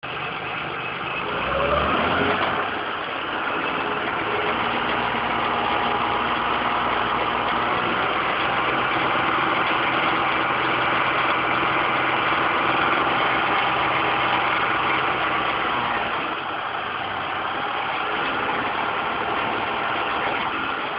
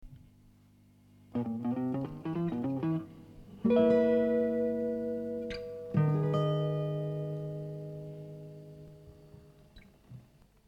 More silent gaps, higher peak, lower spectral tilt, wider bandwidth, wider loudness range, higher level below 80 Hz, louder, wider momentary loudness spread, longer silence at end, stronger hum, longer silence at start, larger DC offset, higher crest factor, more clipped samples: neither; first, -8 dBFS vs -14 dBFS; about the same, -8.5 dB/octave vs -9.5 dB/octave; second, 5.6 kHz vs 6.6 kHz; second, 4 LU vs 11 LU; first, -48 dBFS vs -62 dBFS; first, -22 LUFS vs -32 LUFS; second, 6 LU vs 21 LU; second, 0 s vs 0.45 s; second, none vs 50 Hz at -50 dBFS; about the same, 0.05 s vs 0 s; neither; about the same, 16 dB vs 18 dB; neither